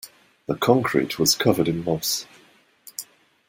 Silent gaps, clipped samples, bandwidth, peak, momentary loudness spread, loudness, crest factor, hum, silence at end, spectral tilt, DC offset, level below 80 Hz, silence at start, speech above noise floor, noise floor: none; under 0.1%; 17 kHz; -2 dBFS; 17 LU; -22 LUFS; 22 dB; none; 0.45 s; -4 dB/octave; under 0.1%; -58 dBFS; 0.05 s; 35 dB; -57 dBFS